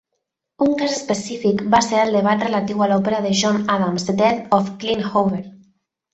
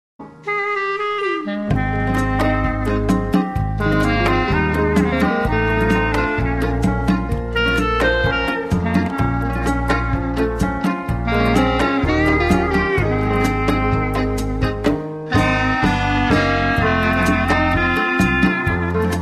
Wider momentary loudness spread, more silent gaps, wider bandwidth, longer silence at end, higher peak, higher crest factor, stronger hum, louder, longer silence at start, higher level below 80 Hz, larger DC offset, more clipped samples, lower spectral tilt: about the same, 6 LU vs 5 LU; neither; second, 8.2 kHz vs 13 kHz; first, 0.6 s vs 0 s; about the same, -2 dBFS vs -2 dBFS; about the same, 18 dB vs 16 dB; neither; about the same, -19 LUFS vs -18 LUFS; first, 0.6 s vs 0.2 s; second, -54 dBFS vs -26 dBFS; neither; neither; second, -5 dB/octave vs -6.5 dB/octave